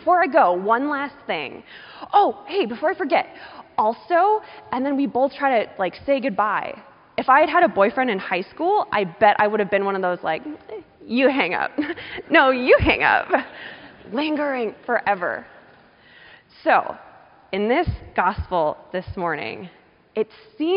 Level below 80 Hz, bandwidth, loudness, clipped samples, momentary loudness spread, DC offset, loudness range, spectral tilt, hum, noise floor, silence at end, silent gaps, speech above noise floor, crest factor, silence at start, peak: -46 dBFS; 5.4 kHz; -21 LUFS; under 0.1%; 16 LU; under 0.1%; 6 LU; -3 dB/octave; none; -51 dBFS; 0 s; none; 30 dB; 18 dB; 0.05 s; -2 dBFS